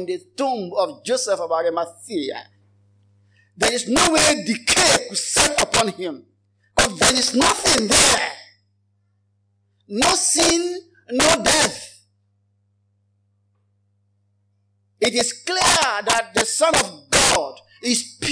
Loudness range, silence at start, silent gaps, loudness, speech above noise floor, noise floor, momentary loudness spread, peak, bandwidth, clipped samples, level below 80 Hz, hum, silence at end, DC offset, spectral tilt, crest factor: 7 LU; 0 s; none; -18 LUFS; 46 dB; -66 dBFS; 13 LU; -2 dBFS; 10.5 kHz; under 0.1%; -46 dBFS; 50 Hz at -60 dBFS; 0 s; under 0.1%; -1.5 dB/octave; 18 dB